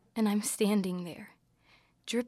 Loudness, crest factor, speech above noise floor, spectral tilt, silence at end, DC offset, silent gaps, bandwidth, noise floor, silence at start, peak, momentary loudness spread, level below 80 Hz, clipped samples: -31 LUFS; 16 dB; 35 dB; -5 dB/octave; 0 s; under 0.1%; none; 15.5 kHz; -66 dBFS; 0.15 s; -18 dBFS; 20 LU; -76 dBFS; under 0.1%